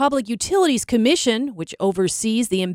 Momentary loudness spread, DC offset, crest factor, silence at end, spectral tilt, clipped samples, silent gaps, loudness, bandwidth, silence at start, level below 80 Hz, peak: 6 LU; under 0.1%; 16 dB; 0 s; -4 dB/octave; under 0.1%; none; -20 LUFS; 16.5 kHz; 0 s; -52 dBFS; -4 dBFS